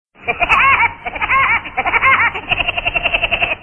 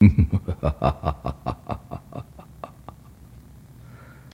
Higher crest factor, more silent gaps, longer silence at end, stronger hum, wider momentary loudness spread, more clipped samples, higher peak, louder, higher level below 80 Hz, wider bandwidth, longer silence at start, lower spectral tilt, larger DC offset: second, 16 dB vs 24 dB; neither; second, 0 s vs 0.4 s; neither; second, 6 LU vs 24 LU; neither; about the same, 0 dBFS vs 0 dBFS; first, -13 LUFS vs -25 LUFS; about the same, -36 dBFS vs -34 dBFS; about the same, 10 kHz vs 10 kHz; first, 0.2 s vs 0 s; second, -4 dB/octave vs -9.5 dB/octave; neither